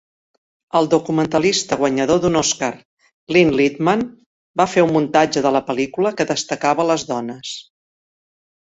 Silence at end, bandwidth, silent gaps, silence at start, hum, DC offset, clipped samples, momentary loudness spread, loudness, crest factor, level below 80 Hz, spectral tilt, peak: 1 s; 8.2 kHz; 2.85-2.97 s, 3.13-3.27 s, 4.26-4.54 s; 0.75 s; none; under 0.1%; under 0.1%; 10 LU; -18 LUFS; 18 dB; -54 dBFS; -4.5 dB/octave; -2 dBFS